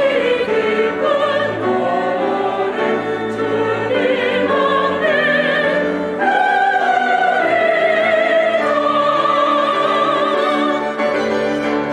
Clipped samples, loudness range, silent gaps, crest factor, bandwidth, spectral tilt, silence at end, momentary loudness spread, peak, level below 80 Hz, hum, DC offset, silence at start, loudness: under 0.1%; 3 LU; none; 14 dB; 11 kHz; -5 dB/octave; 0 s; 4 LU; -2 dBFS; -58 dBFS; none; under 0.1%; 0 s; -16 LUFS